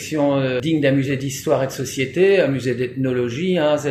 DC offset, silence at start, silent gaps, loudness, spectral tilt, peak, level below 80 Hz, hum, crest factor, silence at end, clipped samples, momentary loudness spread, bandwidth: under 0.1%; 0 s; none; -19 LUFS; -6 dB/octave; -4 dBFS; -56 dBFS; none; 14 dB; 0 s; under 0.1%; 7 LU; 15 kHz